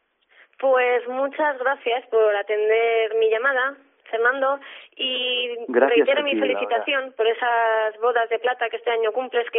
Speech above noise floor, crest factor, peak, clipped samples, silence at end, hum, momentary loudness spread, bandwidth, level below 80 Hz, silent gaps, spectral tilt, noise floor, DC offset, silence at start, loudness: 35 dB; 16 dB; -6 dBFS; under 0.1%; 0 s; none; 6 LU; 3.9 kHz; -90 dBFS; none; 2 dB/octave; -56 dBFS; under 0.1%; 0.6 s; -21 LUFS